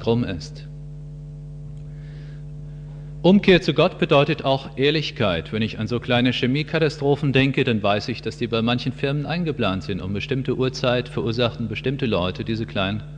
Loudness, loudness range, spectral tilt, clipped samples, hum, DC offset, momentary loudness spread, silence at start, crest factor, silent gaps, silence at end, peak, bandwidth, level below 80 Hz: -21 LUFS; 4 LU; -7 dB/octave; under 0.1%; none; under 0.1%; 19 LU; 0 s; 20 dB; none; 0 s; -2 dBFS; 9.4 kHz; -44 dBFS